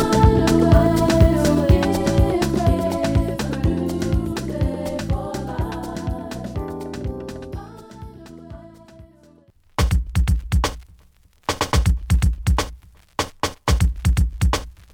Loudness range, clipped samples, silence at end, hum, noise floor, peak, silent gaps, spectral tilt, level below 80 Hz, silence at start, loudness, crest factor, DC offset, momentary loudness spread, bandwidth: 13 LU; under 0.1%; 0.25 s; none; -53 dBFS; 0 dBFS; none; -6.5 dB/octave; -24 dBFS; 0 s; -21 LUFS; 20 dB; under 0.1%; 18 LU; 17 kHz